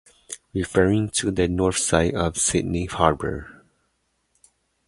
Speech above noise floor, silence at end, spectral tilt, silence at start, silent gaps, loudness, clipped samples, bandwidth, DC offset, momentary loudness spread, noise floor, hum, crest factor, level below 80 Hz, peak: 49 dB; 1.35 s; -4.5 dB/octave; 0.3 s; none; -22 LUFS; under 0.1%; 11.5 kHz; under 0.1%; 11 LU; -71 dBFS; none; 22 dB; -40 dBFS; -2 dBFS